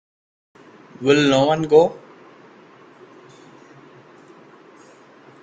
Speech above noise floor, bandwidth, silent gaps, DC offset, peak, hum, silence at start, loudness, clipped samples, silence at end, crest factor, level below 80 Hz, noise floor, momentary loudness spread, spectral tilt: 32 dB; 8.8 kHz; none; under 0.1%; -2 dBFS; none; 1 s; -17 LUFS; under 0.1%; 3.45 s; 22 dB; -62 dBFS; -48 dBFS; 10 LU; -5.5 dB/octave